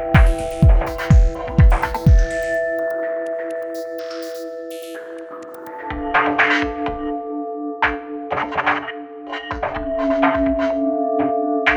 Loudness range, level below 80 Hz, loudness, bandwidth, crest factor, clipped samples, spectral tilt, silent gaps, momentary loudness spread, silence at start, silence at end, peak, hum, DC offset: 7 LU; -22 dBFS; -20 LUFS; over 20 kHz; 18 dB; under 0.1%; -7 dB/octave; none; 15 LU; 0 s; 0 s; 0 dBFS; none; under 0.1%